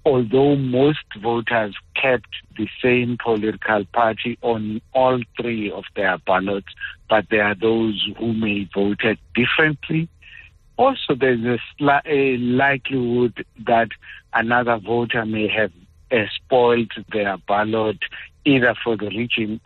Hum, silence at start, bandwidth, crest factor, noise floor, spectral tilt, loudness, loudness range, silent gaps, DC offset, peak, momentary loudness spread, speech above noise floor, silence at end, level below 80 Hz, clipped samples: none; 0.05 s; 4.4 kHz; 16 dB; -45 dBFS; -8.5 dB/octave; -20 LUFS; 2 LU; none; under 0.1%; -4 dBFS; 8 LU; 25 dB; 0.1 s; -52 dBFS; under 0.1%